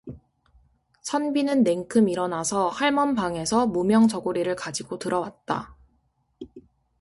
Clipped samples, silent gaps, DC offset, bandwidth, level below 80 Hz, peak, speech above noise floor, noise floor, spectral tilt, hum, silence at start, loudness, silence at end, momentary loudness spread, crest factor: under 0.1%; none; under 0.1%; 11.5 kHz; -58 dBFS; -8 dBFS; 45 dB; -69 dBFS; -4.5 dB/octave; none; 0.05 s; -24 LUFS; 0.4 s; 21 LU; 18 dB